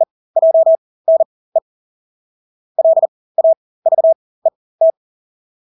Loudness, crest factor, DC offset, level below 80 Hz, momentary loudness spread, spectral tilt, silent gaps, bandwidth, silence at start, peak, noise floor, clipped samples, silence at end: -15 LUFS; 10 dB; under 0.1%; -80 dBFS; 9 LU; -9.5 dB/octave; 0.11-0.34 s, 0.78-1.05 s, 1.25-1.52 s, 1.62-2.75 s, 3.08-3.35 s, 3.57-3.82 s, 4.15-4.42 s, 4.55-4.79 s; 1.1 kHz; 0 s; -4 dBFS; under -90 dBFS; under 0.1%; 0.85 s